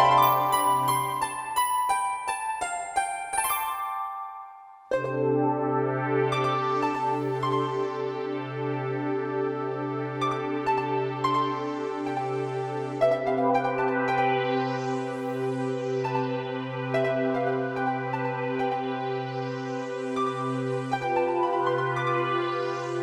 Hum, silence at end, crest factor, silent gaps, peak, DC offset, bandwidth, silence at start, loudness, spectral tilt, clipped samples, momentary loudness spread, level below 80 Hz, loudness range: none; 0 s; 20 dB; none; -6 dBFS; under 0.1%; over 20 kHz; 0 s; -27 LUFS; -5 dB/octave; under 0.1%; 7 LU; -64 dBFS; 3 LU